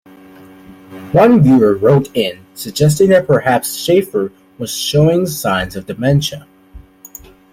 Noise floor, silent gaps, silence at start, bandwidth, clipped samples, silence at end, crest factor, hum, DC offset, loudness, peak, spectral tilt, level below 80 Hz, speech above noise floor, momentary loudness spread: -40 dBFS; none; 0.7 s; 16.5 kHz; under 0.1%; 0.75 s; 14 dB; none; under 0.1%; -13 LUFS; 0 dBFS; -6 dB/octave; -42 dBFS; 27 dB; 14 LU